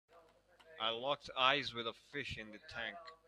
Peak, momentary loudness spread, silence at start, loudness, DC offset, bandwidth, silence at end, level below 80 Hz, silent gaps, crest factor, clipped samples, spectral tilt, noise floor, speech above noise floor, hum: -16 dBFS; 13 LU; 0.1 s; -38 LUFS; under 0.1%; 12.5 kHz; 0.15 s; -70 dBFS; none; 26 dB; under 0.1%; -3.5 dB/octave; -67 dBFS; 27 dB; none